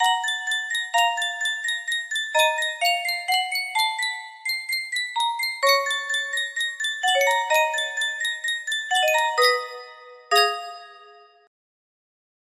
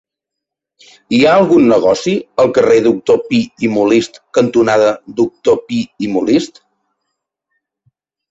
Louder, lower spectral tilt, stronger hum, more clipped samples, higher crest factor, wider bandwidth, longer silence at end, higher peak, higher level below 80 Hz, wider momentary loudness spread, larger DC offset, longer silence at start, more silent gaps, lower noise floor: second, -22 LUFS vs -13 LUFS; second, 3 dB/octave vs -5.5 dB/octave; neither; neither; first, 20 dB vs 12 dB; first, 16 kHz vs 8 kHz; second, 1.25 s vs 1.85 s; about the same, -4 dBFS vs -2 dBFS; second, -76 dBFS vs -52 dBFS; about the same, 7 LU vs 8 LU; neither; second, 0 s vs 1.1 s; neither; second, -50 dBFS vs -81 dBFS